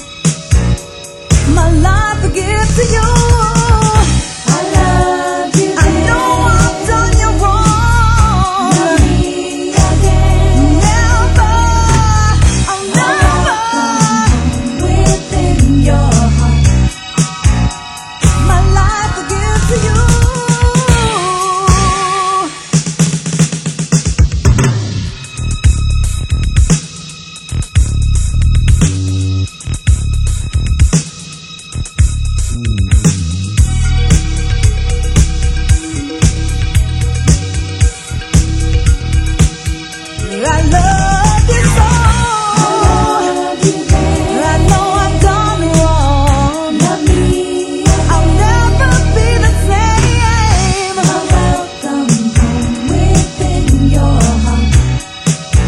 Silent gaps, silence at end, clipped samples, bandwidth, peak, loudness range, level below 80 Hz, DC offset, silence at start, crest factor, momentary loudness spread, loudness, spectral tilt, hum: none; 0 s; 0.2%; 12.5 kHz; 0 dBFS; 4 LU; -14 dBFS; under 0.1%; 0 s; 10 dB; 6 LU; -12 LUFS; -5 dB/octave; none